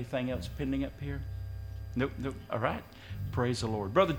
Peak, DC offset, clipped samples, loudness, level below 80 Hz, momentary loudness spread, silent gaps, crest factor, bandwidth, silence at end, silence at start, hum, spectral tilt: -12 dBFS; under 0.1%; under 0.1%; -35 LUFS; -46 dBFS; 10 LU; none; 22 dB; 17 kHz; 0 s; 0 s; none; -6.5 dB/octave